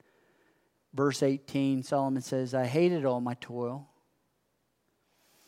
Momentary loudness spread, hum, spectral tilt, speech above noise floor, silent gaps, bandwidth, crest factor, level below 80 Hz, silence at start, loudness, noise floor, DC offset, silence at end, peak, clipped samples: 10 LU; none; -6.5 dB/octave; 47 dB; none; 15 kHz; 18 dB; -80 dBFS; 0.95 s; -30 LUFS; -76 dBFS; under 0.1%; 1.65 s; -14 dBFS; under 0.1%